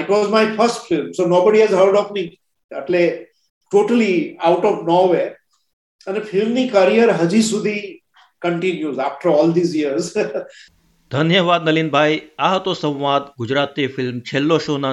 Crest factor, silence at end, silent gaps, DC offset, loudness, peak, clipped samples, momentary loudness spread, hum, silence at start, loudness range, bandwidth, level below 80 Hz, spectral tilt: 16 dB; 0 s; 2.64-2.69 s, 3.50-3.61 s, 5.73-5.99 s; under 0.1%; -17 LUFS; -2 dBFS; under 0.1%; 12 LU; none; 0 s; 2 LU; 12 kHz; -64 dBFS; -5.5 dB/octave